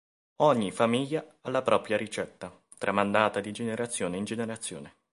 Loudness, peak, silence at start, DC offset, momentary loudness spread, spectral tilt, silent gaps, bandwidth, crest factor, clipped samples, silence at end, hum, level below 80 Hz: -29 LUFS; -6 dBFS; 0.4 s; under 0.1%; 13 LU; -4.5 dB/octave; none; 11.5 kHz; 24 dB; under 0.1%; 0.25 s; none; -66 dBFS